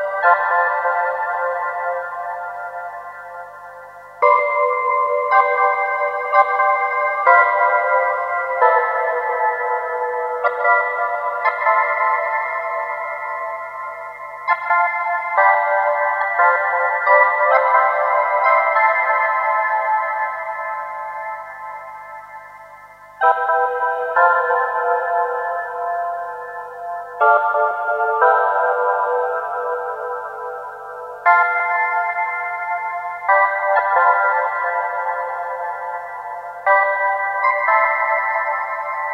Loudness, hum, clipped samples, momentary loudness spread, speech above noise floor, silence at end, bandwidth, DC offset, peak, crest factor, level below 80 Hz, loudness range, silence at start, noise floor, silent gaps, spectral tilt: -18 LUFS; 50 Hz at -65 dBFS; under 0.1%; 14 LU; 24 dB; 0 s; 6.4 kHz; under 0.1%; 0 dBFS; 18 dB; -66 dBFS; 6 LU; 0 s; -41 dBFS; none; -2.5 dB/octave